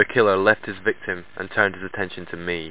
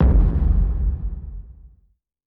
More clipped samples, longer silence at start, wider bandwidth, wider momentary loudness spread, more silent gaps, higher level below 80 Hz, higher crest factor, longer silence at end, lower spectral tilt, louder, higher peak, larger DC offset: neither; about the same, 0 s vs 0 s; first, 4 kHz vs 2.5 kHz; second, 12 LU vs 19 LU; neither; second, -52 dBFS vs -20 dBFS; first, 22 dB vs 12 dB; second, 0 s vs 0.6 s; second, -9 dB/octave vs -12.5 dB/octave; about the same, -22 LUFS vs -22 LUFS; first, 0 dBFS vs -6 dBFS; first, 0.8% vs under 0.1%